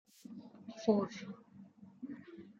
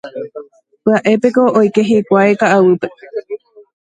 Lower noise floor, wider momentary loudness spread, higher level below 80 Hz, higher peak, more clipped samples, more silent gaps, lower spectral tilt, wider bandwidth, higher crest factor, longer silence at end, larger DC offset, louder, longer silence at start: first, -58 dBFS vs -34 dBFS; first, 24 LU vs 18 LU; second, -84 dBFS vs -58 dBFS; second, -18 dBFS vs 0 dBFS; neither; neither; about the same, -7 dB/octave vs -6.5 dB/octave; second, 8.2 kHz vs 9.2 kHz; first, 22 dB vs 14 dB; second, 0.1 s vs 0.6 s; neither; second, -37 LUFS vs -12 LUFS; first, 0.3 s vs 0.05 s